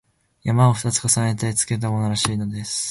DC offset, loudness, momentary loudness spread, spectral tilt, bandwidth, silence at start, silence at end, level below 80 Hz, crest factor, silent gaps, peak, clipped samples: under 0.1%; -21 LUFS; 8 LU; -4.5 dB/octave; 12 kHz; 0.45 s; 0 s; -50 dBFS; 18 dB; none; -2 dBFS; under 0.1%